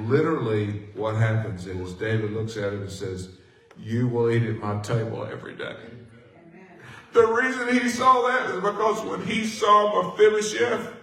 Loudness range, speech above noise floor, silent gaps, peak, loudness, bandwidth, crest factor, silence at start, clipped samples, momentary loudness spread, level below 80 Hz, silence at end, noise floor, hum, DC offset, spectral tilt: 7 LU; 26 dB; none; -6 dBFS; -24 LUFS; 14.5 kHz; 18 dB; 0 s; under 0.1%; 16 LU; -64 dBFS; 0 s; -49 dBFS; none; under 0.1%; -5.5 dB/octave